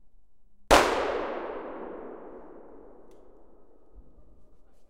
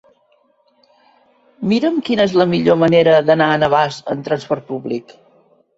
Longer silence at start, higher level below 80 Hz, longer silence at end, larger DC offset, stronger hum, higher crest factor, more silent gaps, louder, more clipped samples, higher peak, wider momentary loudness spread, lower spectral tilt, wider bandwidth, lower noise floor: second, 0.7 s vs 1.6 s; first, -46 dBFS vs -56 dBFS; second, 0 s vs 0.75 s; first, 0.3% vs under 0.1%; neither; first, 28 dB vs 16 dB; neither; second, -26 LUFS vs -15 LUFS; neither; about the same, -2 dBFS vs 0 dBFS; first, 27 LU vs 12 LU; second, -3 dB/octave vs -6.5 dB/octave; first, 16.5 kHz vs 8 kHz; about the same, -59 dBFS vs -58 dBFS